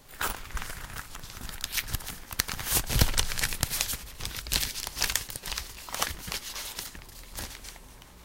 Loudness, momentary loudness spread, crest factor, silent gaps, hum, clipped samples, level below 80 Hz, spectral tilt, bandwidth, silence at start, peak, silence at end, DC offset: -31 LUFS; 15 LU; 32 dB; none; none; under 0.1%; -38 dBFS; -1.5 dB/octave; 17 kHz; 0 s; -2 dBFS; 0 s; under 0.1%